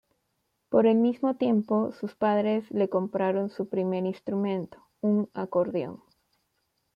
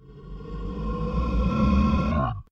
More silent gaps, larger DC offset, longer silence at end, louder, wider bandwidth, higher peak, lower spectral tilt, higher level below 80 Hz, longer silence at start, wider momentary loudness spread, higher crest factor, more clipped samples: neither; neither; first, 1 s vs 0.1 s; about the same, -27 LUFS vs -25 LUFS; second, 5.6 kHz vs 6.8 kHz; about the same, -10 dBFS vs -10 dBFS; about the same, -9.5 dB/octave vs -9 dB/octave; second, -72 dBFS vs -28 dBFS; first, 0.7 s vs 0.05 s; second, 8 LU vs 17 LU; about the same, 18 dB vs 14 dB; neither